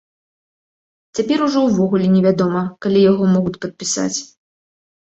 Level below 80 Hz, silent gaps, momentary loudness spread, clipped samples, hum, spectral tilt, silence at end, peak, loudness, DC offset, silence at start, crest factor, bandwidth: -56 dBFS; none; 10 LU; under 0.1%; none; -6 dB/octave; 0.8 s; -2 dBFS; -17 LUFS; under 0.1%; 1.15 s; 16 dB; 8.2 kHz